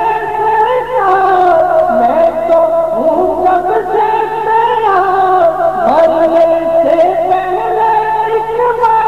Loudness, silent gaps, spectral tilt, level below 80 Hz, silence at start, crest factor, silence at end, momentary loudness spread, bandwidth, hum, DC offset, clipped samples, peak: -11 LUFS; none; -6 dB/octave; -42 dBFS; 0 s; 8 dB; 0 s; 4 LU; 13.5 kHz; none; 1%; under 0.1%; -2 dBFS